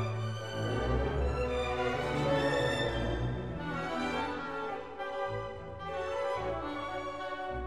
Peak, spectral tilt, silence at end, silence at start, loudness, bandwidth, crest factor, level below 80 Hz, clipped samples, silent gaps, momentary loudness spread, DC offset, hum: -18 dBFS; -6 dB/octave; 0 s; 0 s; -34 LUFS; 13 kHz; 16 dB; -44 dBFS; under 0.1%; none; 8 LU; 0.2%; none